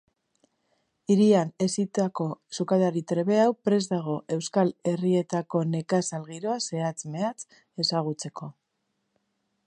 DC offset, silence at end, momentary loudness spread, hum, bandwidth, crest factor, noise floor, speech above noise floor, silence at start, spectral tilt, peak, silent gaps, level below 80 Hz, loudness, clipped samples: under 0.1%; 1.15 s; 11 LU; none; 11 kHz; 18 dB; -78 dBFS; 52 dB; 1.1 s; -5.5 dB/octave; -8 dBFS; none; -74 dBFS; -26 LUFS; under 0.1%